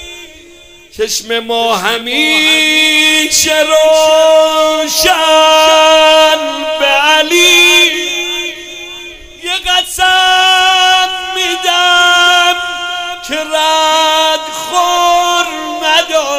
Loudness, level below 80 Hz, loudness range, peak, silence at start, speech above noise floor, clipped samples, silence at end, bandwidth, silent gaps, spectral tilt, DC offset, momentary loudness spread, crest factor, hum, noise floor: -8 LUFS; -44 dBFS; 4 LU; 0 dBFS; 0 s; 29 dB; 0.3%; 0 s; 16.5 kHz; none; 0 dB/octave; under 0.1%; 12 LU; 10 dB; none; -37 dBFS